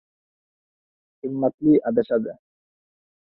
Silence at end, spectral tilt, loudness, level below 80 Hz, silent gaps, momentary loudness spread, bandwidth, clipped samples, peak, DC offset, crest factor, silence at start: 1 s; -12 dB/octave; -22 LUFS; -66 dBFS; 1.54-1.58 s; 15 LU; 4.3 kHz; under 0.1%; -8 dBFS; under 0.1%; 18 dB; 1.25 s